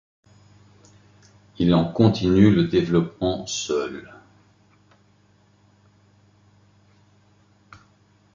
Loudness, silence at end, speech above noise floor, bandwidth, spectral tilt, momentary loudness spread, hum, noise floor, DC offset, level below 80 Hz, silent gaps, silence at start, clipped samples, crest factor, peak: -20 LUFS; 4.3 s; 39 dB; 7.6 kHz; -6.5 dB/octave; 10 LU; 50 Hz at -50 dBFS; -59 dBFS; under 0.1%; -48 dBFS; none; 1.6 s; under 0.1%; 22 dB; -2 dBFS